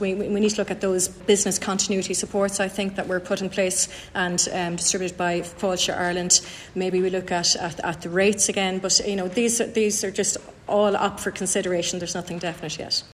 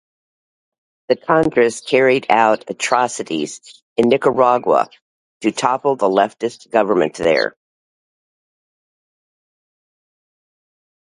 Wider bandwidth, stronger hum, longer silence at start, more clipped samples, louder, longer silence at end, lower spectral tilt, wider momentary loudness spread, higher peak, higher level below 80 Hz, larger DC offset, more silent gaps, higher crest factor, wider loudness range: first, 14 kHz vs 11.5 kHz; neither; second, 0 s vs 1.1 s; neither; second, -23 LUFS vs -17 LUFS; second, 0.1 s vs 3.6 s; second, -2.5 dB/octave vs -4.5 dB/octave; about the same, 8 LU vs 10 LU; second, -4 dBFS vs 0 dBFS; about the same, -54 dBFS vs -58 dBFS; neither; second, none vs 3.82-3.96 s, 5.02-5.40 s; about the same, 20 dB vs 18 dB; second, 2 LU vs 5 LU